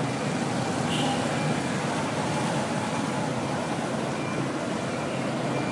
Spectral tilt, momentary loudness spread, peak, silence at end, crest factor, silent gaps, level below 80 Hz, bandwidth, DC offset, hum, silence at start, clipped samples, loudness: -5 dB/octave; 3 LU; -12 dBFS; 0 s; 14 dB; none; -62 dBFS; 11.5 kHz; under 0.1%; none; 0 s; under 0.1%; -28 LUFS